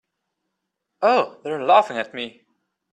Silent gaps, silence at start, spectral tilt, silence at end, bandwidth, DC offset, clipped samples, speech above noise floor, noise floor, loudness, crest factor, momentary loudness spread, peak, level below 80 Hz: none; 1 s; -4.5 dB/octave; 0.65 s; 9.8 kHz; under 0.1%; under 0.1%; 59 dB; -79 dBFS; -20 LUFS; 20 dB; 14 LU; -2 dBFS; -76 dBFS